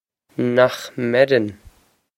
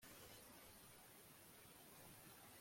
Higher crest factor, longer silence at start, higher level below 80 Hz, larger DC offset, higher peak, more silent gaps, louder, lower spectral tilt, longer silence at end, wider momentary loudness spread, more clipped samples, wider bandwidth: first, 20 dB vs 14 dB; first, 0.4 s vs 0 s; first, -56 dBFS vs -82 dBFS; neither; first, 0 dBFS vs -50 dBFS; neither; first, -19 LUFS vs -62 LUFS; first, -6 dB/octave vs -2.5 dB/octave; first, 0.65 s vs 0 s; first, 12 LU vs 3 LU; neither; about the same, 16.5 kHz vs 16.5 kHz